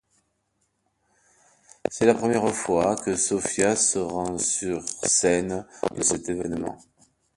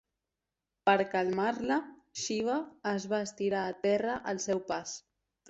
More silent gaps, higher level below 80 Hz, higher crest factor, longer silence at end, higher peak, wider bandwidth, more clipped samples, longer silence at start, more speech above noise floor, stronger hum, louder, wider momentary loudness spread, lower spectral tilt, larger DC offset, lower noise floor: neither; first, -56 dBFS vs -70 dBFS; about the same, 22 dB vs 20 dB; about the same, 0.6 s vs 0.5 s; first, -4 dBFS vs -12 dBFS; first, 11.5 kHz vs 8.2 kHz; neither; first, 1.85 s vs 0.85 s; second, 49 dB vs 57 dB; neither; first, -24 LUFS vs -32 LUFS; about the same, 11 LU vs 9 LU; about the same, -3.5 dB/octave vs -4 dB/octave; neither; second, -73 dBFS vs -89 dBFS